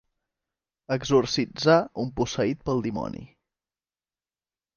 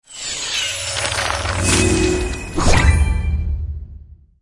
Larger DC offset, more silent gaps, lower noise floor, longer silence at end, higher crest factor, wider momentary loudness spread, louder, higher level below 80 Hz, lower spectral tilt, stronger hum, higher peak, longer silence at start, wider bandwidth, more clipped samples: neither; neither; first, under -90 dBFS vs -40 dBFS; first, 1.5 s vs 0.3 s; about the same, 20 dB vs 18 dB; about the same, 11 LU vs 11 LU; second, -25 LUFS vs -18 LUFS; second, -54 dBFS vs -22 dBFS; first, -5.5 dB/octave vs -4 dB/octave; neither; second, -6 dBFS vs -2 dBFS; first, 0.9 s vs 0.1 s; second, 7.2 kHz vs 11.5 kHz; neither